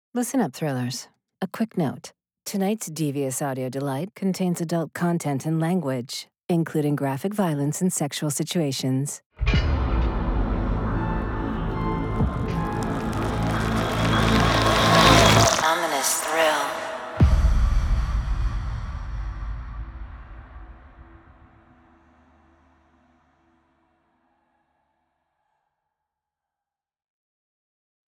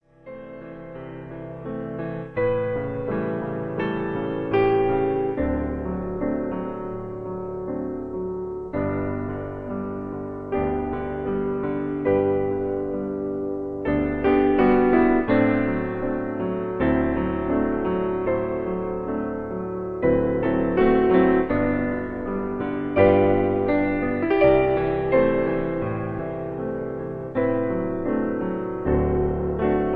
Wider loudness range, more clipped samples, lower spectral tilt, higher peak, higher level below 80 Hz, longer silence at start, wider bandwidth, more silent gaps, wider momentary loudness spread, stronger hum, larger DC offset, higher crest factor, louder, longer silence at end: first, 12 LU vs 8 LU; neither; second, -4.5 dB/octave vs -10.5 dB/octave; about the same, -2 dBFS vs -4 dBFS; first, -32 dBFS vs -40 dBFS; about the same, 0.15 s vs 0.25 s; first, over 20 kHz vs 4.7 kHz; first, 9.26-9.30 s vs none; about the same, 15 LU vs 13 LU; neither; neither; about the same, 22 dB vs 20 dB; about the same, -23 LUFS vs -24 LUFS; first, 7.15 s vs 0 s